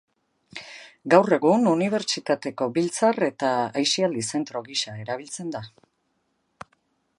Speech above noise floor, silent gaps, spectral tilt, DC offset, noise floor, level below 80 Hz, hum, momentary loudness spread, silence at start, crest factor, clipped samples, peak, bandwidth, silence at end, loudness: 49 dB; none; -4 dB/octave; under 0.1%; -72 dBFS; -72 dBFS; none; 19 LU; 0.55 s; 22 dB; under 0.1%; -2 dBFS; 11.5 kHz; 1.5 s; -23 LUFS